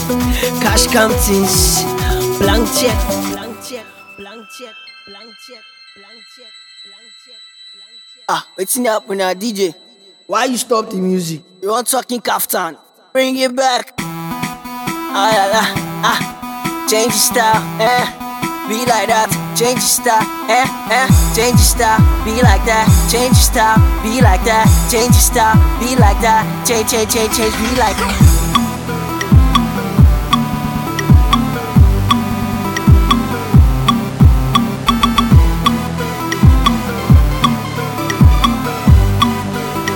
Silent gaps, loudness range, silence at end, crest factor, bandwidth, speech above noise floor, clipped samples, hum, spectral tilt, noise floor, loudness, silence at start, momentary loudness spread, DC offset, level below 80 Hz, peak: none; 8 LU; 0 s; 14 dB; over 20 kHz; 28 dB; 0.1%; none; -4.5 dB/octave; -40 dBFS; -13 LUFS; 0 s; 10 LU; under 0.1%; -20 dBFS; 0 dBFS